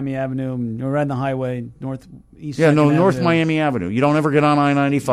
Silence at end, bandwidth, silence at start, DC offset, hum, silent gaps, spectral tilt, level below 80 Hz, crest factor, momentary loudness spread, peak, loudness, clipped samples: 0 s; 12.5 kHz; 0 s; under 0.1%; none; none; -7.5 dB/octave; -52 dBFS; 16 dB; 15 LU; -2 dBFS; -18 LUFS; under 0.1%